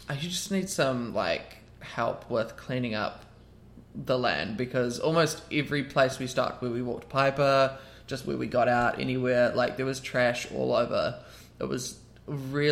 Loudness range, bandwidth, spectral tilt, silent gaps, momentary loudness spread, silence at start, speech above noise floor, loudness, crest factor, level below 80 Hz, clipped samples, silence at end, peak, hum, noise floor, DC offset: 5 LU; 16.5 kHz; -5 dB/octave; none; 13 LU; 0 s; 24 dB; -28 LUFS; 20 dB; -56 dBFS; under 0.1%; 0 s; -10 dBFS; none; -52 dBFS; under 0.1%